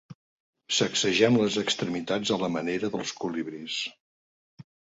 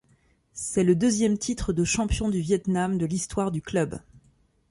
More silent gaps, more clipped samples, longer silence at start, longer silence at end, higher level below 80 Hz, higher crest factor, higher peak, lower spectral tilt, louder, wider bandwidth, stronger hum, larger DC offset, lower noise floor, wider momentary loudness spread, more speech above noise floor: first, 0.15-0.53 s, 4.00-4.57 s vs none; neither; second, 0.1 s vs 0.55 s; second, 0.35 s vs 0.5 s; second, -66 dBFS vs -42 dBFS; first, 22 dB vs 16 dB; about the same, -8 dBFS vs -10 dBFS; second, -3.5 dB/octave vs -5.5 dB/octave; about the same, -27 LUFS vs -25 LUFS; second, 8 kHz vs 11.5 kHz; neither; neither; first, under -90 dBFS vs -64 dBFS; about the same, 10 LU vs 8 LU; first, over 63 dB vs 39 dB